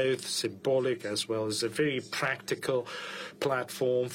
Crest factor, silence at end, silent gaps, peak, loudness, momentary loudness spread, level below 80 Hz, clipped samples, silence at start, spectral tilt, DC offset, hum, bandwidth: 14 dB; 0 s; none; -16 dBFS; -31 LUFS; 4 LU; -72 dBFS; under 0.1%; 0 s; -4 dB/octave; under 0.1%; none; 16.5 kHz